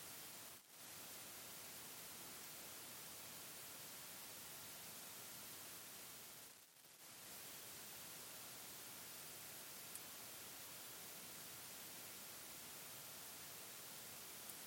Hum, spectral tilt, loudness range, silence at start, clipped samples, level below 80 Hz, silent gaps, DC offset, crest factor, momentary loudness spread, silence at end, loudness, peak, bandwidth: none; -1 dB/octave; 2 LU; 0 s; under 0.1%; -86 dBFS; none; under 0.1%; 24 dB; 2 LU; 0 s; -53 LUFS; -32 dBFS; 17 kHz